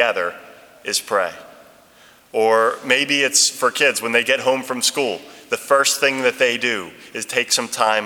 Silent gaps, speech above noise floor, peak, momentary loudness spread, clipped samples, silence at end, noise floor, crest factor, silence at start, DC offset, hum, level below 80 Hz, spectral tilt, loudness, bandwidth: none; 31 dB; 0 dBFS; 12 LU; under 0.1%; 0 s; -50 dBFS; 20 dB; 0 s; under 0.1%; none; -70 dBFS; -0.5 dB/octave; -18 LUFS; 19.5 kHz